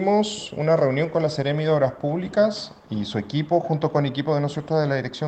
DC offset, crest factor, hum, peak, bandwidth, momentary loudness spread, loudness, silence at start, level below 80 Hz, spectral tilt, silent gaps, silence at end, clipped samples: under 0.1%; 16 dB; none; -6 dBFS; 8.8 kHz; 7 LU; -23 LUFS; 0 s; -58 dBFS; -6.5 dB/octave; none; 0 s; under 0.1%